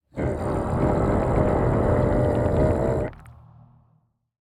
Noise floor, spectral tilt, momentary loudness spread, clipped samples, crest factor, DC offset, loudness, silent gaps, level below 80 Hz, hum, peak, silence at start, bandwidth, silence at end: -65 dBFS; -9 dB/octave; 6 LU; under 0.1%; 14 dB; under 0.1%; -23 LUFS; none; -34 dBFS; none; -8 dBFS; 0.15 s; 10.5 kHz; 1.15 s